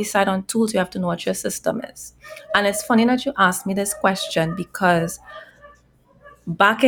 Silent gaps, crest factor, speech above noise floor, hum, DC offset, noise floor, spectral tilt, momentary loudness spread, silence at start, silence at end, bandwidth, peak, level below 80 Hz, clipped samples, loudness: none; 18 dB; 35 dB; none; under 0.1%; -55 dBFS; -4 dB/octave; 18 LU; 0 s; 0 s; 19.5 kHz; -2 dBFS; -56 dBFS; under 0.1%; -20 LUFS